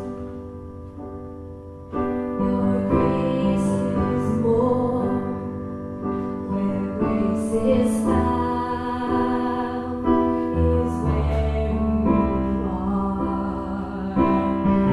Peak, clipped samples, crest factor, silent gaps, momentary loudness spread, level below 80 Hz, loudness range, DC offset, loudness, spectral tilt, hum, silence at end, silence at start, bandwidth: -6 dBFS; under 0.1%; 16 dB; none; 13 LU; -34 dBFS; 2 LU; under 0.1%; -23 LUFS; -8.5 dB/octave; none; 0 s; 0 s; 12 kHz